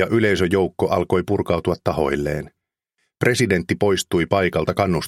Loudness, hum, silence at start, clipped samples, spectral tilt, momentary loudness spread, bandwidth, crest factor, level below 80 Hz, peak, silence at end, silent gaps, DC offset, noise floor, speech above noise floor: -20 LUFS; none; 0 s; under 0.1%; -5.5 dB/octave; 5 LU; 16 kHz; 20 dB; -44 dBFS; 0 dBFS; 0 s; none; under 0.1%; -73 dBFS; 54 dB